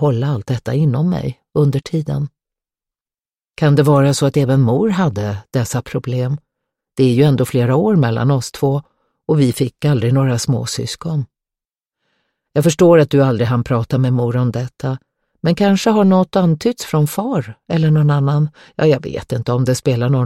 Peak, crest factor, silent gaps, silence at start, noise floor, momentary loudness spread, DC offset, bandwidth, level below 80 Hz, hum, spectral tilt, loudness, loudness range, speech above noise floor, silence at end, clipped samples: 0 dBFS; 14 dB; none; 0 s; under -90 dBFS; 10 LU; under 0.1%; 15 kHz; -48 dBFS; none; -7 dB/octave; -16 LUFS; 3 LU; over 75 dB; 0 s; under 0.1%